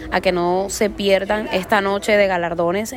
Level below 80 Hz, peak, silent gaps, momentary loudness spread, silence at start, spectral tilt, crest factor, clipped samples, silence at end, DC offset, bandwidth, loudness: -42 dBFS; -4 dBFS; none; 4 LU; 0 s; -4 dB/octave; 14 dB; under 0.1%; 0 s; under 0.1%; 16.5 kHz; -18 LUFS